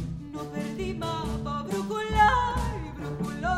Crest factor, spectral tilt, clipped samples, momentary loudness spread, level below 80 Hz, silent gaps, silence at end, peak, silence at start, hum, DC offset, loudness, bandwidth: 20 dB; -5.5 dB/octave; under 0.1%; 14 LU; -38 dBFS; none; 0 s; -8 dBFS; 0 s; none; under 0.1%; -28 LUFS; 15.5 kHz